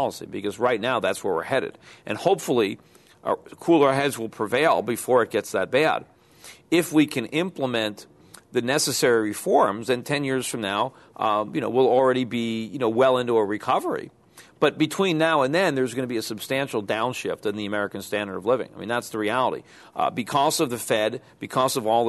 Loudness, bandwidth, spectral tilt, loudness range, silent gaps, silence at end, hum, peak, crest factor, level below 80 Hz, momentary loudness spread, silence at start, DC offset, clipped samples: -24 LUFS; 12.5 kHz; -4.5 dB/octave; 3 LU; none; 0 s; none; -4 dBFS; 20 dB; -66 dBFS; 9 LU; 0 s; under 0.1%; under 0.1%